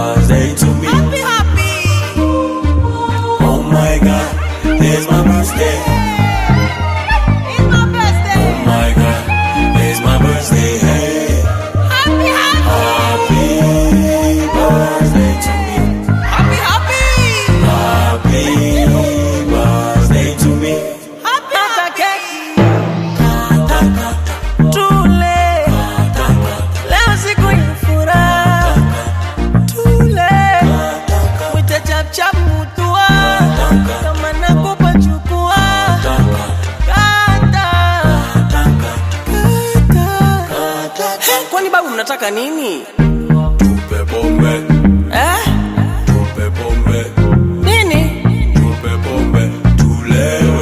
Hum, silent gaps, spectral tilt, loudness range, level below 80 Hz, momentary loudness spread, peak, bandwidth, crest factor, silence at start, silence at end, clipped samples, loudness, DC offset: none; none; -5.5 dB/octave; 2 LU; -18 dBFS; 6 LU; 0 dBFS; 15.5 kHz; 12 dB; 0 s; 0 s; under 0.1%; -12 LUFS; under 0.1%